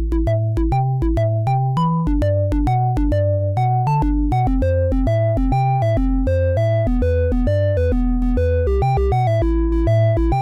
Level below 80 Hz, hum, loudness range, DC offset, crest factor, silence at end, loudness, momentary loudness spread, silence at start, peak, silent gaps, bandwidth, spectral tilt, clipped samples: -22 dBFS; none; 0 LU; under 0.1%; 10 dB; 0 s; -18 LUFS; 2 LU; 0 s; -8 dBFS; none; 7.4 kHz; -9.5 dB/octave; under 0.1%